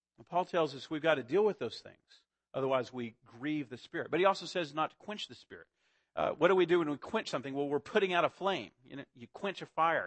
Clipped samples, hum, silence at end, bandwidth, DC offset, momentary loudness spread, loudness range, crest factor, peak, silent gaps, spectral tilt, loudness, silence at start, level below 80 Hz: under 0.1%; none; 0 s; 8.6 kHz; under 0.1%; 15 LU; 4 LU; 20 dB; -14 dBFS; none; -5.5 dB/octave; -34 LUFS; 0.2 s; -76 dBFS